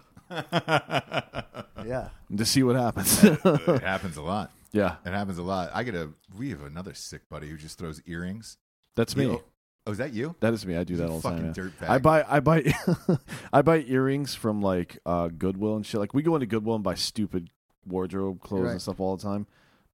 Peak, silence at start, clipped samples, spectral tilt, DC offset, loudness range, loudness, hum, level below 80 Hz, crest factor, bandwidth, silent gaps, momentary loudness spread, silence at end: -4 dBFS; 0.3 s; under 0.1%; -5.5 dB/octave; under 0.1%; 9 LU; -27 LUFS; none; -52 dBFS; 24 dB; 16.5 kHz; 7.26-7.30 s, 8.61-8.83 s, 9.57-9.79 s, 17.56-17.69 s, 17.78-17.82 s; 17 LU; 0.5 s